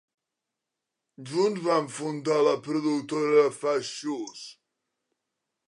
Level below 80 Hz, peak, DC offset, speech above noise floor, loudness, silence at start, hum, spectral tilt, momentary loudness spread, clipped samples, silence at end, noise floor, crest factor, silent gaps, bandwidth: -82 dBFS; -8 dBFS; under 0.1%; 60 dB; -26 LUFS; 1.2 s; none; -5 dB/octave; 15 LU; under 0.1%; 1.15 s; -86 dBFS; 20 dB; none; 11 kHz